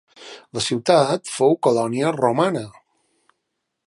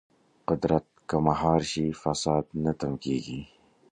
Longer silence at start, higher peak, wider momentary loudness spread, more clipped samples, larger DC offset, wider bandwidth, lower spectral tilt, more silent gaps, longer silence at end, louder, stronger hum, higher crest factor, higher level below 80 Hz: second, 0.2 s vs 0.5 s; first, -2 dBFS vs -8 dBFS; first, 18 LU vs 7 LU; neither; neither; first, 11.5 kHz vs 9.8 kHz; about the same, -5 dB/octave vs -6 dB/octave; neither; first, 1.15 s vs 0.45 s; first, -20 LUFS vs -28 LUFS; neither; about the same, 20 dB vs 20 dB; second, -64 dBFS vs -50 dBFS